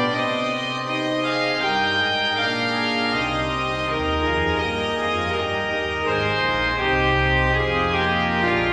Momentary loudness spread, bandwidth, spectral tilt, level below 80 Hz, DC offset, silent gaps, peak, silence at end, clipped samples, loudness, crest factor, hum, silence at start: 4 LU; 12 kHz; -5 dB/octave; -36 dBFS; under 0.1%; none; -6 dBFS; 0 s; under 0.1%; -21 LUFS; 16 dB; none; 0 s